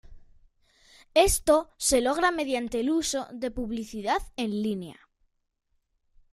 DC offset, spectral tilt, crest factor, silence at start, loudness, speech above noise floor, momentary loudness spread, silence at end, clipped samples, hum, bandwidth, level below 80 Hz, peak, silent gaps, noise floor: under 0.1%; -3 dB/octave; 22 dB; 0.1 s; -26 LUFS; 46 dB; 11 LU; 1.4 s; under 0.1%; none; 15.5 kHz; -46 dBFS; -6 dBFS; none; -73 dBFS